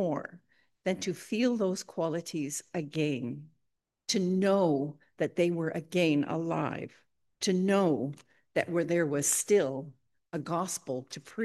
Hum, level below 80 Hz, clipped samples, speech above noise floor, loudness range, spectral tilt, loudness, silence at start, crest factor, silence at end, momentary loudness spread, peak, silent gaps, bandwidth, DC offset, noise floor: none; -78 dBFS; under 0.1%; 51 dB; 4 LU; -4.5 dB/octave; -31 LUFS; 0 s; 18 dB; 0 s; 13 LU; -14 dBFS; none; 12.5 kHz; under 0.1%; -82 dBFS